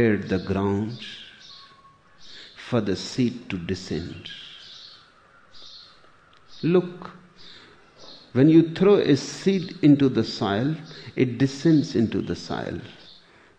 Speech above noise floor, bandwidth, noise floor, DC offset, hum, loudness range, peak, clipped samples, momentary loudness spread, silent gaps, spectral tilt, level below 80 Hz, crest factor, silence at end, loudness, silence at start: 32 dB; 9.2 kHz; -54 dBFS; under 0.1%; none; 10 LU; -6 dBFS; under 0.1%; 25 LU; none; -7 dB/octave; -58 dBFS; 20 dB; 0.65 s; -23 LUFS; 0 s